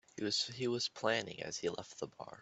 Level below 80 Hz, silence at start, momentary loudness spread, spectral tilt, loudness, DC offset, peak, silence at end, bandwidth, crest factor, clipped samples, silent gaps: -78 dBFS; 0.15 s; 11 LU; -3 dB/octave; -38 LUFS; under 0.1%; -18 dBFS; 0 s; 8.2 kHz; 22 dB; under 0.1%; none